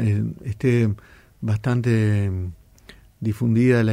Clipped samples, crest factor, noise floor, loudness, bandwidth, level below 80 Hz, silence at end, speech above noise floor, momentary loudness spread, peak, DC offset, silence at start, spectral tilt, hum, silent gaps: under 0.1%; 14 dB; -49 dBFS; -22 LUFS; 11 kHz; -48 dBFS; 0 s; 28 dB; 12 LU; -8 dBFS; under 0.1%; 0 s; -8.5 dB/octave; none; none